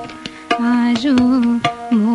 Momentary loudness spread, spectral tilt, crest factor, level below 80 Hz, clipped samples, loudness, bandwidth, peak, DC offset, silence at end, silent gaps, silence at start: 10 LU; -5.5 dB/octave; 14 dB; -50 dBFS; under 0.1%; -16 LUFS; 11 kHz; -2 dBFS; under 0.1%; 0 s; none; 0 s